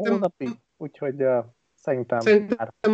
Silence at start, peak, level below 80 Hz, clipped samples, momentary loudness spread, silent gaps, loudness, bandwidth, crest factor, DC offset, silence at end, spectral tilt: 0 s; -8 dBFS; -70 dBFS; under 0.1%; 17 LU; none; -24 LUFS; 7.8 kHz; 16 dB; under 0.1%; 0 s; -7 dB/octave